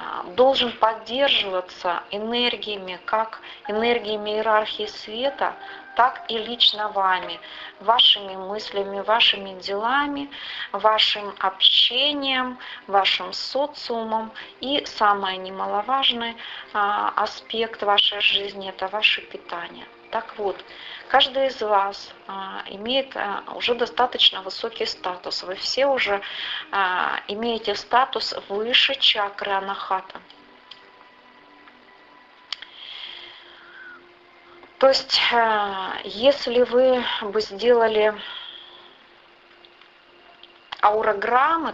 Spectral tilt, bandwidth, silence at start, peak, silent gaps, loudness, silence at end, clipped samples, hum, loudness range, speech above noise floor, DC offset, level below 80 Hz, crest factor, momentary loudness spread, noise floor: -2.5 dB/octave; 8 kHz; 0 s; -4 dBFS; none; -21 LUFS; 0 s; under 0.1%; none; 6 LU; 29 dB; under 0.1%; -62 dBFS; 20 dB; 16 LU; -52 dBFS